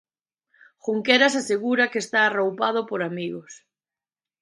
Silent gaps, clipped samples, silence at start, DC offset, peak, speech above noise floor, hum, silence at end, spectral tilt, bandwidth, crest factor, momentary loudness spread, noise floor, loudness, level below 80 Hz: none; under 0.1%; 0.85 s; under 0.1%; -2 dBFS; over 67 dB; none; 0.85 s; -3.5 dB/octave; 11.5 kHz; 22 dB; 14 LU; under -90 dBFS; -22 LUFS; -76 dBFS